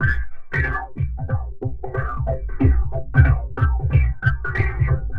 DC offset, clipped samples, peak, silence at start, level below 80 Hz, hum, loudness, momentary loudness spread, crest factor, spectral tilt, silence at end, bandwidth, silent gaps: 1%; under 0.1%; -2 dBFS; 0 s; -24 dBFS; none; -22 LUFS; 9 LU; 18 dB; -10 dB/octave; 0 s; 4.9 kHz; none